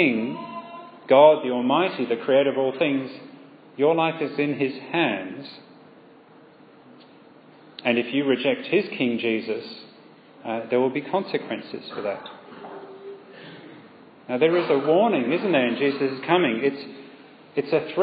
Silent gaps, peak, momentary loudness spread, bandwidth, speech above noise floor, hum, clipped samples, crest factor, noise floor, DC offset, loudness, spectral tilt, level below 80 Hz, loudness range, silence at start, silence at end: none; -2 dBFS; 21 LU; 5 kHz; 28 dB; none; under 0.1%; 22 dB; -50 dBFS; under 0.1%; -23 LUFS; -9.5 dB/octave; -82 dBFS; 9 LU; 0 s; 0 s